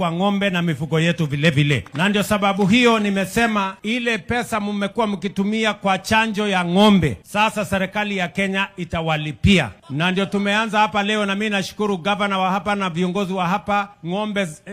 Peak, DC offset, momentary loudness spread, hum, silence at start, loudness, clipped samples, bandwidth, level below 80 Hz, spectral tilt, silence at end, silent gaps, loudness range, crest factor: -2 dBFS; under 0.1%; 6 LU; none; 0 s; -19 LUFS; under 0.1%; 15.5 kHz; -46 dBFS; -5.5 dB/octave; 0 s; none; 3 LU; 18 dB